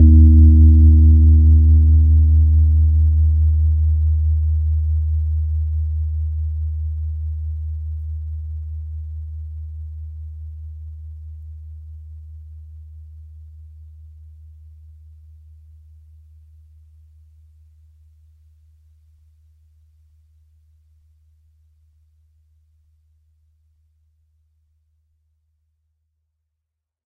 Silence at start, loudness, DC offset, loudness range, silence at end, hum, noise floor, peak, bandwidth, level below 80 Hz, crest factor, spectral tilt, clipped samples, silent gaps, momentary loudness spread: 0 s; -16 LUFS; under 0.1%; 27 LU; 13.85 s; none; -81 dBFS; -2 dBFS; 0.5 kHz; -20 dBFS; 16 dB; -13 dB/octave; under 0.1%; none; 27 LU